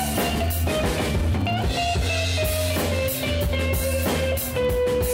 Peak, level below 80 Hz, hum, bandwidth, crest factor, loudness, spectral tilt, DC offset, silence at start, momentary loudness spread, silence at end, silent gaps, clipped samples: -14 dBFS; -30 dBFS; none; 16.5 kHz; 10 dB; -23 LUFS; -4.5 dB/octave; under 0.1%; 0 s; 1 LU; 0 s; none; under 0.1%